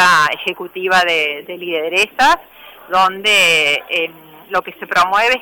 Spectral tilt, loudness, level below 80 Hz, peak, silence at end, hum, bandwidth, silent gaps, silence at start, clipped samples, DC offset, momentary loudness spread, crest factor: -1.5 dB/octave; -14 LUFS; -52 dBFS; -6 dBFS; 0 s; none; over 20 kHz; none; 0 s; under 0.1%; under 0.1%; 11 LU; 10 dB